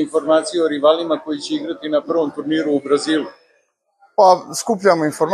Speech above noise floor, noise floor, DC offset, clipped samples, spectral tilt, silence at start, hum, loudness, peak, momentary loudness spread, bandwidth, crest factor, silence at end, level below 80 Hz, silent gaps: 46 dB; -63 dBFS; under 0.1%; under 0.1%; -4 dB/octave; 0 s; none; -18 LUFS; 0 dBFS; 10 LU; 13 kHz; 18 dB; 0 s; -68 dBFS; none